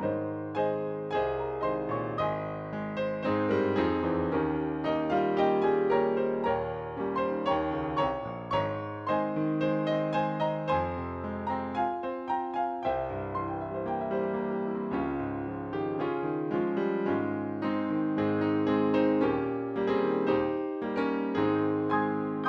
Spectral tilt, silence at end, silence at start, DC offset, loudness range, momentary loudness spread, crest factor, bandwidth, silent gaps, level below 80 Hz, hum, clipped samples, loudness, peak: -8.5 dB/octave; 0 s; 0 s; under 0.1%; 4 LU; 7 LU; 16 dB; 6.4 kHz; none; -56 dBFS; none; under 0.1%; -30 LUFS; -14 dBFS